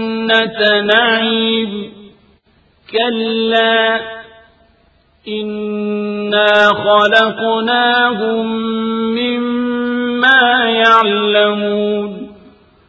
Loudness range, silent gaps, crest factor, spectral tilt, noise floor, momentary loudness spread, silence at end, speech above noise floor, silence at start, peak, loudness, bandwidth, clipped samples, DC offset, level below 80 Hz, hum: 5 LU; none; 14 dB; -5 dB/octave; -53 dBFS; 12 LU; 0.55 s; 40 dB; 0 s; 0 dBFS; -13 LUFS; 8 kHz; under 0.1%; under 0.1%; -56 dBFS; none